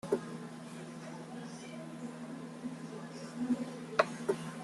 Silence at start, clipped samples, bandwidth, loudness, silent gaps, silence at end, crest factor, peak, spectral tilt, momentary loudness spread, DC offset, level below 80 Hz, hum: 0.05 s; under 0.1%; 12.5 kHz; -40 LUFS; none; 0 s; 28 dB; -12 dBFS; -5.5 dB/octave; 13 LU; under 0.1%; -78 dBFS; none